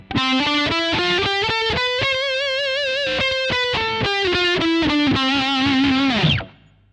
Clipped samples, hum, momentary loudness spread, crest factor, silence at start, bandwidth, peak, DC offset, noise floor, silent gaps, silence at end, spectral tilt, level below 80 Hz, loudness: under 0.1%; none; 3 LU; 14 dB; 0 s; 10 kHz; -6 dBFS; under 0.1%; -43 dBFS; none; 0.4 s; -4.5 dB/octave; -44 dBFS; -18 LUFS